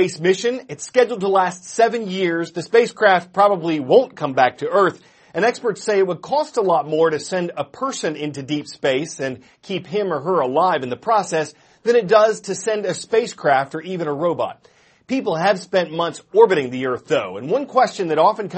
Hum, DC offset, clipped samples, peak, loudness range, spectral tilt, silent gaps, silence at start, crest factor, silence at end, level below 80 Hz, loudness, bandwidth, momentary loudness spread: none; under 0.1%; under 0.1%; 0 dBFS; 4 LU; -4.5 dB/octave; none; 0 s; 18 dB; 0 s; -68 dBFS; -19 LUFS; 8.8 kHz; 10 LU